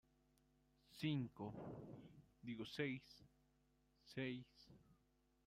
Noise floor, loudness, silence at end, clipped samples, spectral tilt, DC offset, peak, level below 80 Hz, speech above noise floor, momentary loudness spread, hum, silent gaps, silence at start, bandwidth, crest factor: -81 dBFS; -50 LUFS; 0.5 s; under 0.1%; -6.5 dB/octave; under 0.1%; -32 dBFS; -78 dBFS; 32 dB; 21 LU; none; none; 0.9 s; 15.5 kHz; 20 dB